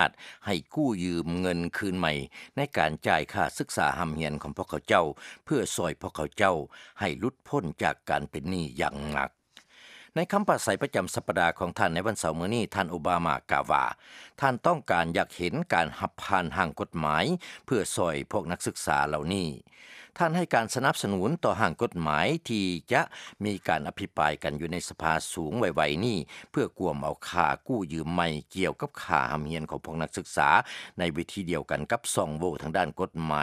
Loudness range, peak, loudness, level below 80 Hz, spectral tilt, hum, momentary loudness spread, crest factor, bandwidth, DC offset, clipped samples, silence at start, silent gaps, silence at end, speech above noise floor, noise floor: 2 LU; -4 dBFS; -29 LUFS; -54 dBFS; -4.5 dB/octave; none; 8 LU; 24 dB; 15.5 kHz; under 0.1%; under 0.1%; 0 s; none; 0 s; 26 dB; -55 dBFS